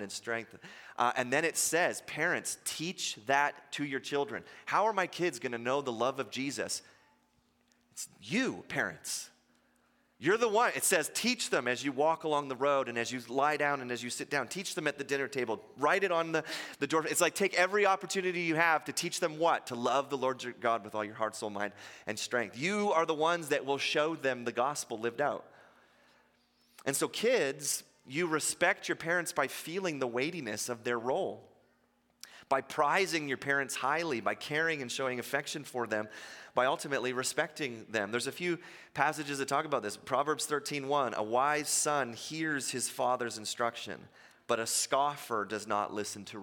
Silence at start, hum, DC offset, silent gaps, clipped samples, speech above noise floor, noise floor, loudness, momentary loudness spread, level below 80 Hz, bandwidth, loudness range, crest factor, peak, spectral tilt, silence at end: 0 s; none; under 0.1%; none; under 0.1%; 39 dB; -72 dBFS; -32 LUFS; 9 LU; -80 dBFS; 17 kHz; 5 LU; 22 dB; -10 dBFS; -2.5 dB/octave; 0 s